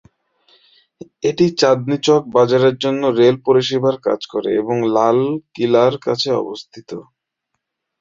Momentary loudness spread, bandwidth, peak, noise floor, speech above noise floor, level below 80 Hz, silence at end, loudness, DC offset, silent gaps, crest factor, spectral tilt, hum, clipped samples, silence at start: 9 LU; 7.6 kHz; -2 dBFS; -76 dBFS; 60 dB; -60 dBFS; 1 s; -16 LUFS; under 0.1%; none; 16 dB; -5.5 dB/octave; none; under 0.1%; 1.25 s